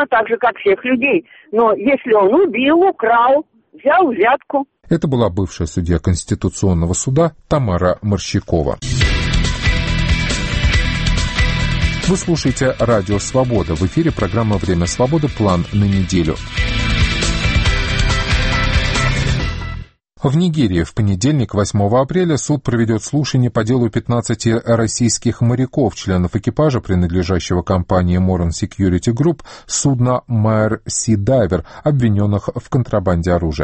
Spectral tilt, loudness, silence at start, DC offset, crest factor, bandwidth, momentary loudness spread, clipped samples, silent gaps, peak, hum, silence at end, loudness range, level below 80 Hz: -5.5 dB/octave; -16 LUFS; 0 s; under 0.1%; 14 dB; 8.8 kHz; 5 LU; under 0.1%; none; -2 dBFS; none; 0 s; 3 LU; -26 dBFS